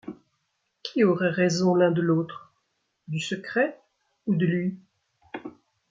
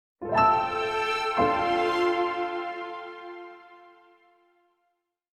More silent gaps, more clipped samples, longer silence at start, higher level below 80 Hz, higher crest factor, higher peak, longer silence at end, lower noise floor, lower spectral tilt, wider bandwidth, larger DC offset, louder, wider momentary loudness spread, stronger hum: neither; neither; second, 0.05 s vs 0.2 s; second, -70 dBFS vs -58 dBFS; about the same, 18 dB vs 20 dB; about the same, -8 dBFS vs -8 dBFS; second, 0.4 s vs 1.6 s; about the same, -76 dBFS vs -77 dBFS; about the same, -6 dB/octave vs -5 dB/octave; second, 7.6 kHz vs 12 kHz; neither; about the same, -25 LUFS vs -26 LUFS; about the same, 20 LU vs 19 LU; neither